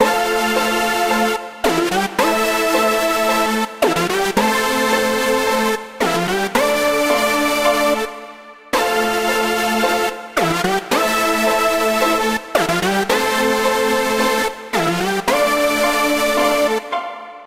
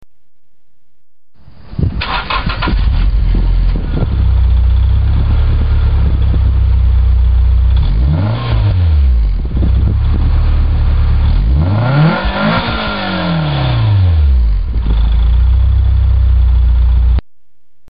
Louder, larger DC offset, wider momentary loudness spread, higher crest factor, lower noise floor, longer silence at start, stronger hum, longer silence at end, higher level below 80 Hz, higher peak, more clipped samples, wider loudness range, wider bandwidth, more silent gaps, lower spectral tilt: second, -17 LUFS vs -13 LUFS; second, under 0.1% vs 3%; about the same, 4 LU vs 5 LU; first, 16 dB vs 8 dB; second, -37 dBFS vs -66 dBFS; second, 0 s vs 1.7 s; neither; second, 0 s vs 0.75 s; second, -46 dBFS vs -12 dBFS; about the same, 0 dBFS vs -2 dBFS; neither; about the same, 1 LU vs 3 LU; first, 16 kHz vs 5.2 kHz; neither; second, -3 dB/octave vs -11 dB/octave